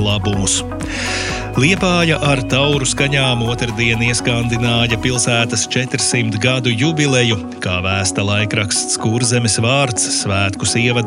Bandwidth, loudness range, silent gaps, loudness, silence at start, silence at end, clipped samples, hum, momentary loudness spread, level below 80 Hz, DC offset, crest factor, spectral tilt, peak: 12.5 kHz; 1 LU; none; -15 LUFS; 0 s; 0 s; under 0.1%; none; 5 LU; -36 dBFS; under 0.1%; 16 dB; -3.5 dB/octave; 0 dBFS